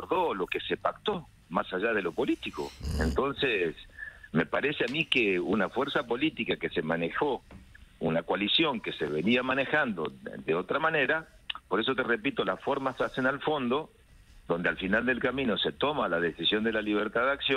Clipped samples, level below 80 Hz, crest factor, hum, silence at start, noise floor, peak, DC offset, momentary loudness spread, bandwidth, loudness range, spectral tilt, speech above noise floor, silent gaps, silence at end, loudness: under 0.1%; -50 dBFS; 18 dB; none; 0 s; -55 dBFS; -10 dBFS; under 0.1%; 8 LU; 14.5 kHz; 2 LU; -5.5 dB/octave; 26 dB; none; 0 s; -29 LUFS